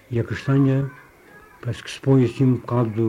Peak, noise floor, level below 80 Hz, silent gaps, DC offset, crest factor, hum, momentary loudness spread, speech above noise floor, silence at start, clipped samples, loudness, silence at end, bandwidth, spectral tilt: -6 dBFS; -48 dBFS; -54 dBFS; none; under 0.1%; 14 dB; none; 13 LU; 28 dB; 0.1 s; under 0.1%; -21 LUFS; 0 s; 10.5 kHz; -8 dB/octave